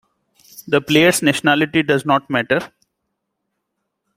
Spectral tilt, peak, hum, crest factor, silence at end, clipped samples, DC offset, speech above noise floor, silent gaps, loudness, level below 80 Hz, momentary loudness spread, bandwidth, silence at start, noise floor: -4 dB/octave; -2 dBFS; none; 18 dB; 1.5 s; under 0.1%; under 0.1%; 59 dB; none; -16 LUFS; -58 dBFS; 7 LU; 16 kHz; 0.6 s; -75 dBFS